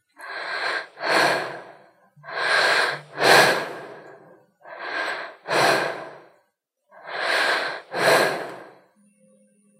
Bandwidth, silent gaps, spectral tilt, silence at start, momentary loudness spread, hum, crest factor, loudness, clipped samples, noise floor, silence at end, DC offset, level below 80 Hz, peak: 16 kHz; none; -2 dB/octave; 0.2 s; 19 LU; none; 24 dB; -21 LUFS; under 0.1%; -72 dBFS; 1.1 s; under 0.1%; -82 dBFS; 0 dBFS